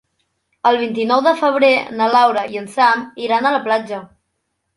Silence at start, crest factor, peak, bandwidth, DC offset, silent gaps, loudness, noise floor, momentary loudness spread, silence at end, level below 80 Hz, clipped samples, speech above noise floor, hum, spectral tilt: 0.65 s; 16 dB; -2 dBFS; 11.5 kHz; under 0.1%; none; -16 LUFS; -72 dBFS; 8 LU; 0.7 s; -66 dBFS; under 0.1%; 56 dB; none; -4.5 dB/octave